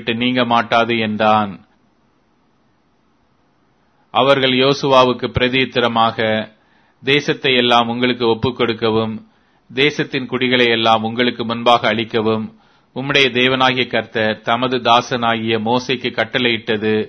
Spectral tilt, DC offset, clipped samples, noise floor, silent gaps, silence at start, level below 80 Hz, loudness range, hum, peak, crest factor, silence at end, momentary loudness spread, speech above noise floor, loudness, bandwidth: -5 dB/octave; under 0.1%; under 0.1%; -59 dBFS; none; 0 s; -50 dBFS; 4 LU; none; 0 dBFS; 16 dB; 0 s; 8 LU; 44 dB; -16 LUFS; 7.8 kHz